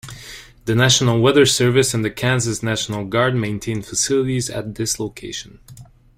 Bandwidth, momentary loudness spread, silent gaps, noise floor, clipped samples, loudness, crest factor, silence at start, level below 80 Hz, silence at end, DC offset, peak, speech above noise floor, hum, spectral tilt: 16 kHz; 16 LU; none; -39 dBFS; under 0.1%; -18 LUFS; 18 dB; 0.05 s; -46 dBFS; 0.35 s; under 0.1%; 0 dBFS; 21 dB; none; -4 dB/octave